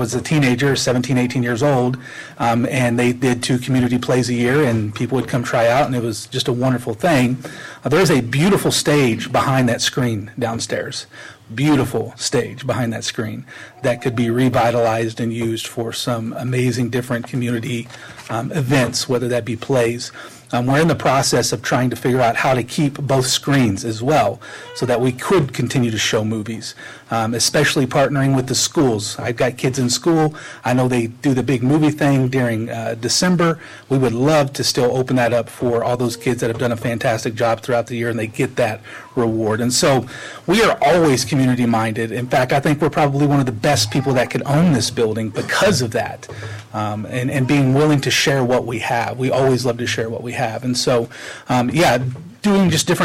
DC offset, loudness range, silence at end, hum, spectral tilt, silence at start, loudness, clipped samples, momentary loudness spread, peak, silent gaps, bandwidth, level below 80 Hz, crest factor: under 0.1%; 4 LU; 0 s; none; -5 dB/octave; 0 s; -18 LUFS; under 0.1%; 9 LU; -6 dBFS; none; 16 kHz; -48 dBFS; 12 dB